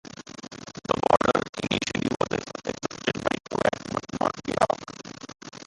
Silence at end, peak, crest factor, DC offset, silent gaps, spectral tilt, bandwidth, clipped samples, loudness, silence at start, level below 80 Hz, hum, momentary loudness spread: 0.05 s; -4 dBFS; 24 dB; under 0.1%; 1.49-1.53 s; -4.5 dB/octave; 11.5 kHz; under 0.1%; -27 LUFS; 0.25 s; -54 dBFS; none; 19 LU